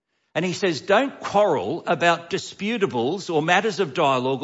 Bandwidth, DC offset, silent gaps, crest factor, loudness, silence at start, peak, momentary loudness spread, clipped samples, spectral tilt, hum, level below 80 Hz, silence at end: 8 kHz; under 0.1%; none; 16 dB; -22 LUFS; 0.35 s; -6 dBFS; 7 LU; under 0.1%; -4.5 dB/octave; none; -66 dBFS; 0 s